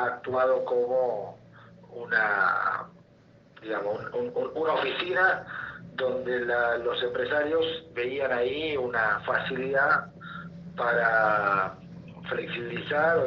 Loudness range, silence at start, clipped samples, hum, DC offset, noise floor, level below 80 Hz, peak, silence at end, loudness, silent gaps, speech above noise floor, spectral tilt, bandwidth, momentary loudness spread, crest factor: 3 LU; 0 s; under 0.1%; none; under 0.1%; -57 dBFS; -64 dBFS; -10 dBFS; 0 s; -27 LUFS; none; 30 dB; -6.5 dB/octave; 6.4 kHz; 17 LU; 18 dB